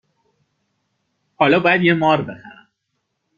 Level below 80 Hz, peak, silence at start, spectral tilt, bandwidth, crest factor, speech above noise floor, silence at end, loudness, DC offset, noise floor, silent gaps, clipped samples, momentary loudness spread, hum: -60 dBFS; -2 dBFS; 1.4 s; -7.5 dB/octave; 7 kHz; 18 dB; 58 dB; 0.9 s; -16 LUFS; under 0.1%; -74 dBFS; none; under 0.1%; 16 LU; none